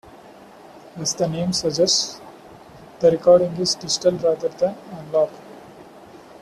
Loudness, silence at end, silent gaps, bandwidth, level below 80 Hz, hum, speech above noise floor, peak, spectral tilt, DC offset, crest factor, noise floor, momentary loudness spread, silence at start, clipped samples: -20 LUFS; 0.25 s; none; 13 kHz; -58 dBFS; none; 25 dB; -4 dBFS; -4 dB/octave; under 0.1%; 18 dB; -44 dBFS; 13 LU; 0.15 s; under 0.1%